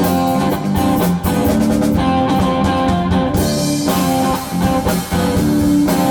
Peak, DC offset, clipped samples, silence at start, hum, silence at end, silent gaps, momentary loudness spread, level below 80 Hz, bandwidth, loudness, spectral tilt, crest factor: -2 dBFS; under 0.1%; under 0.1%; 0 s; none; 0 s; none; 3 LU; -32 dBFS; over 20 kHz; -15 LUFS; -6 dB/octave; 12 dB